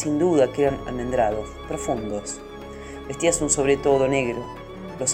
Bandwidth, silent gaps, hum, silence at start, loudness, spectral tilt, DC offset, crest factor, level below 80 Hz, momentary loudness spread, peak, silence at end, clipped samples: 15.5 kHz; none; none; 0 s; -23 LUFS; -4.5 dB/octave; under 0.1%; 18 dB; -42 dBFS; 17 LU; -6 dBFS; 0 s; under 0.1%